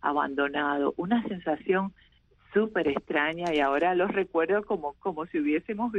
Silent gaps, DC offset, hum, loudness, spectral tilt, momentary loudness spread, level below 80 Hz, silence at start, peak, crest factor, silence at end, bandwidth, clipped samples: none; under 0.1%; none; -28 LUFS; -7 dB/octave; 6 LU; -60 dBFS; 0.05 s; -12 dBFS; 16 dB; 0 s; 7.8 kHz; under 0.1%